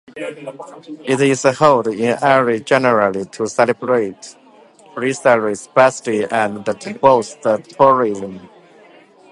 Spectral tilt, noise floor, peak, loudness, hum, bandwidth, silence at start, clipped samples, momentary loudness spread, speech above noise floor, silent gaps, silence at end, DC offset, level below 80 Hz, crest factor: -5 dB/octave; -46 dBFS; 0 dBFS; -16 LUFS; none; 11.5 kHz; 0.15 s; under 0.1%; 16 LU; 30 dB; none; 0.85 s; under 0.1%; -62 dBFS; 16 dB